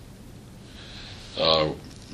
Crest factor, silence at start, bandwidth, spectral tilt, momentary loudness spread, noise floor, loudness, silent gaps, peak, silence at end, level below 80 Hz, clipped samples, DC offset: 24 dB; 0 s; 14 kHz; -4.5 dB/octave; 24 LU; -45 dBFS; -24 LUFS; none; -6 dBFS; 0 s; -48 dBFS; under 0.1%; under 0.1%